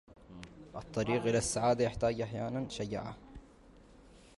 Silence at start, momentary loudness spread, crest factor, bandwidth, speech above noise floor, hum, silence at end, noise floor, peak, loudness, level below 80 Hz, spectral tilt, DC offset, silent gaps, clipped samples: 0.1 s; 21 LU; 18 dB; 11.5 kHz; 25 dB; none; 0.15 s; -58 dBFS; -18 dBFS; -34 LUFS; -56 dBFS; -5 dB/octave; under 0.1%; none; under 0.1%